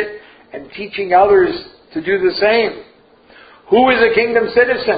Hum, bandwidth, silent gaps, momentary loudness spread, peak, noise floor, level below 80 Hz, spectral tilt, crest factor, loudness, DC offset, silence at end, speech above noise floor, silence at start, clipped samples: none; 5 kHz; none; 18 LU; 0 dBFS; -47 dBFS; -48 dBFS; -10 dB/octave; 16 dB; -14 LUFS; under 0.1%; 0 s; 33 dB; 0 s; under 0.1%